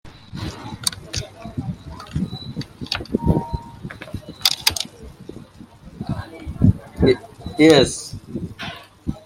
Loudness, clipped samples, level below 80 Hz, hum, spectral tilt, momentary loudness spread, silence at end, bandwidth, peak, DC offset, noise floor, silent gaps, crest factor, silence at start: -22 LUFS; under 0.1%; -38 dBFS; none; -5 dB/octave; 19 LU; 0.05 s; 16.5 kHz; 0 dBFS; under 0.1%; -43 dBFS; none; 22 dB; 0.05 s